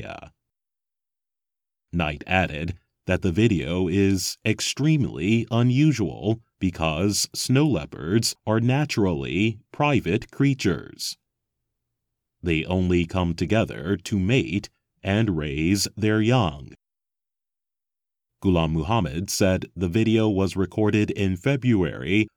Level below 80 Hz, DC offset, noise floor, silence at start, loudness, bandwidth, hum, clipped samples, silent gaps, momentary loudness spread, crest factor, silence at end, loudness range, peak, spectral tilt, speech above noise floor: -46 dBFS; under 0.1%; under -90 dBFS; 0 s; -23 LUFS; 18 kHz; none; under 0.1%; none; 7 LU; 18 dB; 0.1 s; 4 LU; -4 dBFS; -5.5 dB/octave; over 67 dB